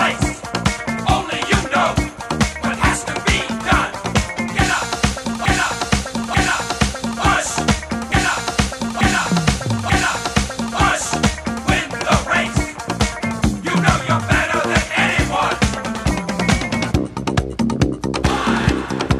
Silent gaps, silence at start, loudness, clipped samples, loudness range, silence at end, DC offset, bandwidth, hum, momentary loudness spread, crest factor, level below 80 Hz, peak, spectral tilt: none; 0 s; -18 LUFS; under 0.1%; 1 LU; 0 s; under 0.1%; 15.5 kHz; none; 5 LU; 18 dB; -28 dBFS; 0 dBFS; -4 dB/octave